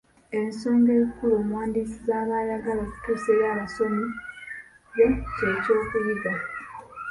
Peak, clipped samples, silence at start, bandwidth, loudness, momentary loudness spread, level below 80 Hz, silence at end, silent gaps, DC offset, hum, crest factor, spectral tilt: -8 dBFS; under 0.1%; 0.3 s; 11.5 kHz; -25 LUFS; 15 LU; -48 dBFS; 0 s; none; under 0.1%; none; 16 dB; -7 dB/octave